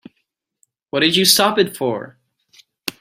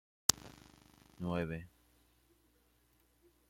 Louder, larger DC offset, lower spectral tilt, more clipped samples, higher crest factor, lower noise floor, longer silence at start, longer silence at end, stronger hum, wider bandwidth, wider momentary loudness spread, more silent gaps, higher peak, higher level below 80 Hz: first, -15 LUFS vs -37 LUFS; neither; about the same, -2.5 dB/octave vs -2.5 dB/octave; neither; second, 20 dB vs 42 dB; about the same, -72 dBFS vs -72 dBFS; first, 0.95 s vs 0.3 s; second, 0.1 s vs 1.85 s; neither; about the same, 16 kHz vs 16.5 kHz; about the same, 17 LU vs 18 LU; neither; about the same, 0 dBFS vs 0 dBFS; about the same, -62 dBFS vs -66 dBFS